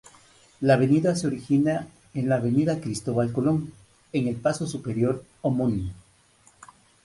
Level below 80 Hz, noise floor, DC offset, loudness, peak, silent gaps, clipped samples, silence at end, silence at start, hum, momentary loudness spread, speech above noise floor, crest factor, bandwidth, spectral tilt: -52 dBFS; -59 dBFS; under 0.1%; -25 LUFS; -6 dBFS; none; under 0.1%; 1.1 s; 0.6 s; none; 10 LU; 35 dB; 18 dB; 11.5 kHz; -7 dB/octave